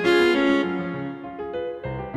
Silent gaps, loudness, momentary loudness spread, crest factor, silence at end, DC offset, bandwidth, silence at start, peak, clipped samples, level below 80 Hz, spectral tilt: none; -23 LUFS; 14 LU; 14 dB; 0 s; under 0.1%; 12 kHz; 0 s; -8 dBFS; under 0.1%; -50 dBFS; -6 dB/octave